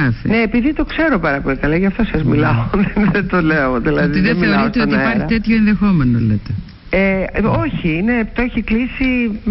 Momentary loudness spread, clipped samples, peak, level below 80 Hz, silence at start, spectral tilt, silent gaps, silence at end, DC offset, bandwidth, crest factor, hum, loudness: 4 LU; under 0.1%; -6 dBFS; -30 dBFS; 0 s; -12 dB/octave; none; 0 s; under 0.1%; 5.8 kHz; 8 dB; none; -15 LUFS